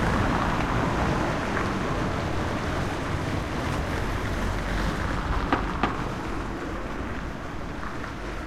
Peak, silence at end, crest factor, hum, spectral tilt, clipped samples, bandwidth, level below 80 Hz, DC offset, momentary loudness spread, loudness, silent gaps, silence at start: -6 dBFS; 0 s; 20 dB; none; -6 dB/octave; under 0.1%; 14.5 kHz; -34 dBFS; under 0.1%; 9 LU; -28 LUFS; none; 0 s